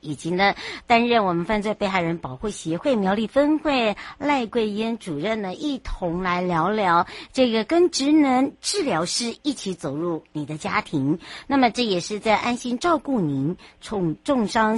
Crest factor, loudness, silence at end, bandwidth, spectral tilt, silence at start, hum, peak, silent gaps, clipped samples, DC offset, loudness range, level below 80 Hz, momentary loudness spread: 18 dB; -23 LUFS; 0 s; 11.5 kHz; -4.5 dB/octave; 0.05 s; none; -4 dBFS; none; under 0.1%; under 0.1%; 3 LU; -48 dBFS; 9 LU